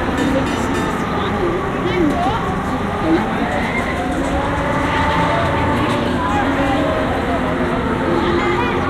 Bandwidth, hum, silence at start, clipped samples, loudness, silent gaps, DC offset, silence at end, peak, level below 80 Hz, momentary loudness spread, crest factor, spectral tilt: 15 kHz; none; 0 s; under 0.1%; -18 LUFS; none; under 0.1%; 0 s; -4 dBFS; -30 dBFS; 3 LU; 12 dB; -6 dB/octave